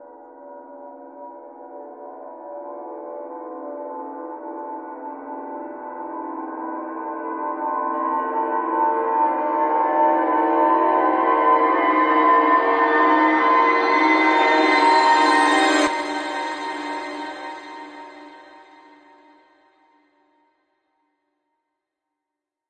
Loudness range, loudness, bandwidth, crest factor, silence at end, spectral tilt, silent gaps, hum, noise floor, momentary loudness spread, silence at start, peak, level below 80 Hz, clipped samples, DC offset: 19 LU; -18 LUFS; 10.5 kHz; 18 dB; 4.15 s; -2 dB/octave; none; none; -85 dBFS; 22 LU; 0 s; -4 dBFS; -68 dBFS; under 0.1%; under 0.1%